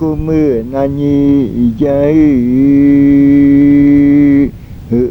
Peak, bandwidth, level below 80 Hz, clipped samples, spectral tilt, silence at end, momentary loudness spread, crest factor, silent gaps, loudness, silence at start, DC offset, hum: 0 dBFS; 3.9 kHz; -30 dBFS; under 0.1%; -10 dB/octave; 0 s; 7 LU; 8 dB; none; -9 LUFS; 0 s; under 0.1%; none